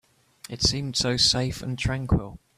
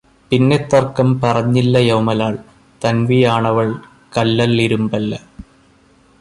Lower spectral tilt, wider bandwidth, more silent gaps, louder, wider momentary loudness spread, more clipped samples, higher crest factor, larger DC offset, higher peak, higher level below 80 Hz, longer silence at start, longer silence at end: second, -3.5 dB/octave vs -7 dB/octave; first, 14.5 kHz vs 11.5 kHz; neither; second, -24 LUFS vs -15 LUFS; about the same, 9 LU vs 9 LU; neither; about the same, 18 dB vs 14 dB; neither; second, -8 dBFS vs -2 dBFS; first, -40 dBFS vs -46 dBFS; first, 0.5 s vs 0.3 s; second, 0.2 s vs 0.8 s